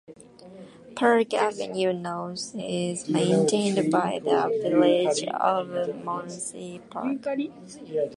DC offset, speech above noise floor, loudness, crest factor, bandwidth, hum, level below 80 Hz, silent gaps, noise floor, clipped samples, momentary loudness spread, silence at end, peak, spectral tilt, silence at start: under 0.1%; 22 dB; -25 LUFS; 18 dB; 11.5 kHz; none; -70 dBFS; none; -47 dBFS; under 0.1%; 13 LU; 0 s; -8 dBFS; -5 dB/octave; 0.1 s